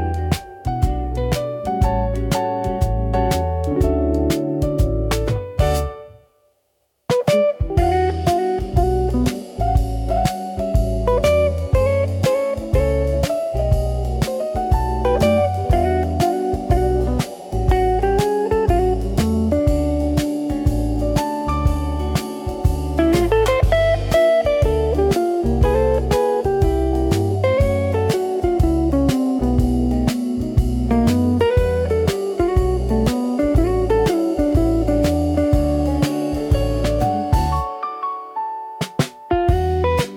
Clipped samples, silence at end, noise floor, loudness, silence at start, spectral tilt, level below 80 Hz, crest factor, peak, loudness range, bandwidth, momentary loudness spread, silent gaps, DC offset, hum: under 0.1%; 0 s; -67 dBFS; -19 LUFS; 0 s; -7 dB/octave; -24 dBFS; 14 dB; -4 dBFS; 3 LU; 18 kHz; 6 LU; none; under 0.1%; none